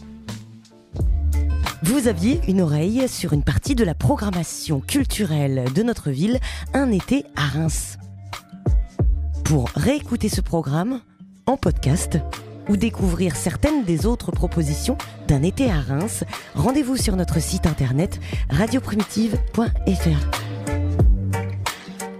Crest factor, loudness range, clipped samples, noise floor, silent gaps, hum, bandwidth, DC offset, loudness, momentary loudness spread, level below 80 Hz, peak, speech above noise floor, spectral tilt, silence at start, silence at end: 18 dB; 2 LU; under 0.1%; -45 dBFS; none; none; 16 kHz; under 0.1%; -22 LUFS; 8 LU; -28 dBFS; -2 dBFS; 25 dB; -6 dB/octave; 0 s; 0 s